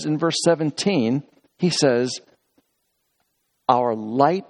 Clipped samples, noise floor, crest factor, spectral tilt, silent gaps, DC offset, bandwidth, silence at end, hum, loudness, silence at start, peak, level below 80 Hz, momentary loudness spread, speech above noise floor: under 0.1%; -72 dBFS; 20 dB; -5 dB/octave; none; under 0.1%; 11.5 kHz; 0.05 s; none; -21 LUFS; 0 s; -2 dBFS; -68 dBFS; 8 LU; 52 dB